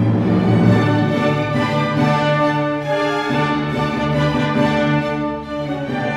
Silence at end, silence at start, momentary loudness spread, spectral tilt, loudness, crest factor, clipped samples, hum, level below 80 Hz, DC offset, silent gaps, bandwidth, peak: 0 s; 0 s; 8 LU; -7.5 dB/octave; -17 LUFS; 14 dB; under 0.1%; none; -42 dBFS; under 0.1%; none; 11.5 kHz; -2 dBFS